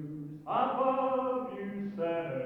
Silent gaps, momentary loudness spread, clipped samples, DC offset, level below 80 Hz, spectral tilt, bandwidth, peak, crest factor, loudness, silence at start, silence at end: none; 10 LU; under 0.1%; under 0.1%; -72 dBFS; -8.5 dB/octave; 4.7 kHz; -16 dBFS; 16 dB; -32 LUFS; 0 s; 0 s